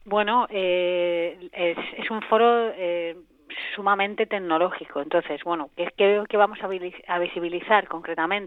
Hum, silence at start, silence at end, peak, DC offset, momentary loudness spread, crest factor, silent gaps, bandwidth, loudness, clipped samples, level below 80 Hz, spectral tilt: none; 0.05 s; 0 s; -2 dBFS; under 0.1%; 11 LU; 22 dB; none; 4.5 kHz; -24 LUFS; under 0.1%; -64 dBFS; -7 dB/octave